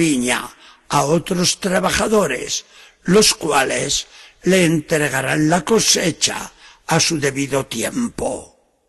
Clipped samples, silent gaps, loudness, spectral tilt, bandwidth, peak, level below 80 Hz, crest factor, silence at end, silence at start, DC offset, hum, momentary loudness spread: under 0.1%; none; -17 LUFS; -3.5 dB/octave; 13 kHz; -2 dBFS; -46 dBFS; 18 dB; 0.45 s; 0 s; under 0.1%; none; 11 LU